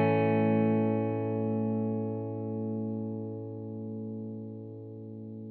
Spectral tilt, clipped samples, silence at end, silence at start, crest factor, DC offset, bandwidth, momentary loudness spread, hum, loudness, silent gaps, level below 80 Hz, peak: -8.5 dB/octave; under 0.1%; 0 s; 0 s; 16 dB; under 0.1%; 4.4 kHz; 17 LU; 50 Hz at -70 dBFS; -31 LUFS; none; -82 dBFS; -16 dBFS